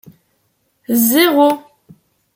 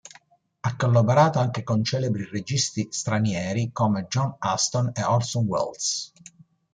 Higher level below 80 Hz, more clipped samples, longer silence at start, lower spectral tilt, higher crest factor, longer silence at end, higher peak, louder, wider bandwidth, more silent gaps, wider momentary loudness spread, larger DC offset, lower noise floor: second, -66 dBFS vs -60 dBFS; neither; first, 0.9 s vs 0.65 s; second, -3 dB/octave vs -5 dB/octave; about the same, 16 dB vs 18 dB; about the same, 0.75 s vs 0.65 s; first, 0 dBFS vs -6 dBFS; first, -13 LUFS vs -24 LUFS; first, 17 kHz vs 9.4 kHz; neither; about the same, 9 LU vs 8 LU; neither; first, -64 dBFS vs -57 dBFS